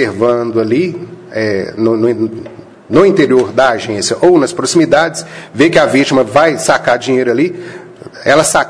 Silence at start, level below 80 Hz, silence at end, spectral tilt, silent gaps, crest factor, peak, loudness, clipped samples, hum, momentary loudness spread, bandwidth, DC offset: 0 s; -48 dBFS; 0 s; -4.5 dB/octave; none; 12 dB; 0 dBFS; -11 LUFS; 0.3%; none; 14 LU; 11 kHz; under 0.1%